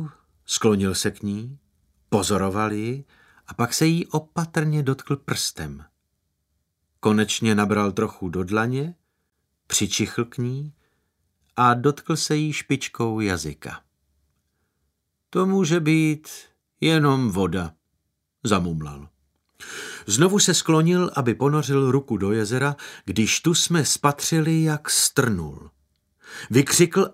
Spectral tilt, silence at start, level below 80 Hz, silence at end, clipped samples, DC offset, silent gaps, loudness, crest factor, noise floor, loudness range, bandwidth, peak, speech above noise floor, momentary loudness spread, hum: -4.5 dB/octave; 0 s; -54 dBFS; 0 s; under 0.1%; under 0.1%; none; -22 LUFS; 22 dB; -75 dBFS; 5 LU; 16 kHz; -2 dBFS; 53 dB; 15 LU; none